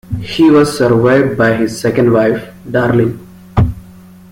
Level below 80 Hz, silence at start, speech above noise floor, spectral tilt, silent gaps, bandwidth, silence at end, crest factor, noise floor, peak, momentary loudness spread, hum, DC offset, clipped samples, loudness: -34 dBFS; 0.1 s; 26 dB; -7 dB/octave; none; 16.5 kHz; 0.4 s; 12 dB; -37 dBFS; 0 dBFS; 10 LU; none; under 0.1%; under 0.1%; -12 LUFS